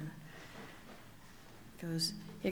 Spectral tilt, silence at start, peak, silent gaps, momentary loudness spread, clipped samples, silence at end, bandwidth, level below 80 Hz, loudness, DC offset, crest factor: -4 dB/octave; 0 s; -22 dBFS; none; 20 LU; under 0.1%; 0 s; over 20 kHz; -64 dBFS; -41 LUFS; under 0.1%; 22 dB